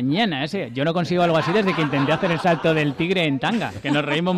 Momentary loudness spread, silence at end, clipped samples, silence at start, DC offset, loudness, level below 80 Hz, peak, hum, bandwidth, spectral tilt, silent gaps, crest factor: 4 LU; 0 s; under 0.1%; 0 s; under 0.1%; -21 LUFS; -56 dBFS; -10 dBFS; none; 13 kHz; -6.5 dB/octave; none; 10 dB